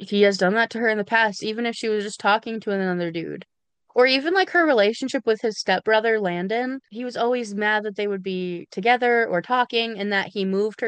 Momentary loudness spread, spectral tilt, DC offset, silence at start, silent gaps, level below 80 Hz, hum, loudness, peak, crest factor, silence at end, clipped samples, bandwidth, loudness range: 9 LU; -4.5 dB/octave; under 0.1%; 0 s; none; -74 dBFS; none; -22 LUFS; -6 dBFS; 18 dB; 0 s; under 0.1%; 9.8 kHz; 3 LU